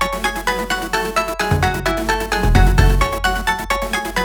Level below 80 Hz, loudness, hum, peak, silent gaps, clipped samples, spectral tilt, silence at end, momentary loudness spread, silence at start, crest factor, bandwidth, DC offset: -20 dBFS; -18 LUFS; none; 0 dBFS; none; under 0.1%; -4.5 dB/octave; 0 s; 6 LU; 0 s; 16 dB; over 20 kHz; under 0.1%